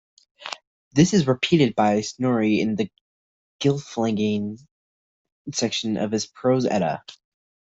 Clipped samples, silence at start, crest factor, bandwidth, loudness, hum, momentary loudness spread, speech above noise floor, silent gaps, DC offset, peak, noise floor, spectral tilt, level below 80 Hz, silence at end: under 0.1%; 0.4 s; 20 dB; 8 kHz; -22 LUFS; none; 17 LU; over 68 dB; 0.67-0.91 s, 3.01-3.59 s, 4.71-5.25 s, 5.32-5.45 s; under 0.1%; -4 dBFS; under -90 dBFS; -5.5 dB/octave; -58 dBFS; 0.55 s